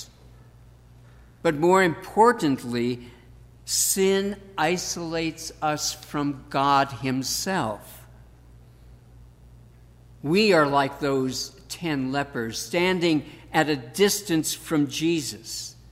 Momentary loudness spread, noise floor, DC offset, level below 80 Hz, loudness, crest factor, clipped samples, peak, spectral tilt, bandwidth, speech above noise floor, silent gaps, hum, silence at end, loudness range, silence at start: 12 LU; -50 dBFS; under 0.1%; -54 dBFS; -24 LUFS; 20 dB; under 0.1%; -6 dBFS; -4 dB/octave; 16 kHz; 27 dB; none; none; 0.2 s; 4 LU; 0 s